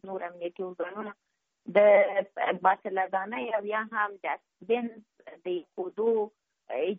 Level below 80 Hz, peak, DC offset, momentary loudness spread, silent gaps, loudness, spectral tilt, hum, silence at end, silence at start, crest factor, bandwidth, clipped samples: -82 dBFS; -10 dBFS; under 0.1%; 15 LU; none; -28 LUFS; -3 dB/octave; none; 0 s; 0.05 s; 20 dB; 3.8 kHz; under 0.1%